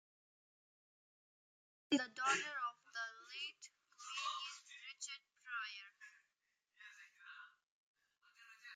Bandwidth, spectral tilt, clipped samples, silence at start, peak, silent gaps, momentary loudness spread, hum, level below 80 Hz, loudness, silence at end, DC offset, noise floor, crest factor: 9.6 kHz; -1 dB/octave; under 0.1%; 1.9 s; -24 dBFS; 7.68-7.94 s; 22 LU; none; under -90 dBFS; -44 LUFS; 0 s; under 0.1%; -88 dBFS; 24 dB